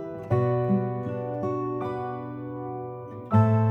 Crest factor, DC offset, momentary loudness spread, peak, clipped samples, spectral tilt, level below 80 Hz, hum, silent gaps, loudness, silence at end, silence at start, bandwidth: 16 dB; under 0.1%; 13 LU; -10 dBFS; under 0.1%; -11 dB/octave; -60 dBFS; none; none; -27 LUFS; 0 s; 0 s; 4.2 kHz